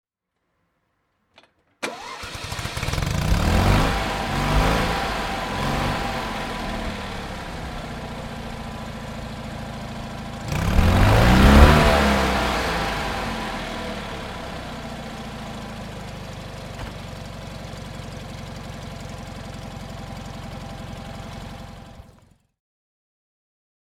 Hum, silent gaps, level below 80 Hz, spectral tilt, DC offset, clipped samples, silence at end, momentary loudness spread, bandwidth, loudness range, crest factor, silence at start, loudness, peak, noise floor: none; none; -28 dBFS; -5.5 dB/octave; under 0.1%; under 0.1%; 1.8 s; 18 LU; 16.5 kHz; 18 LU; 24 dB; 1.8 s; -23 LUFS; 0 dBFS; -77 dBFS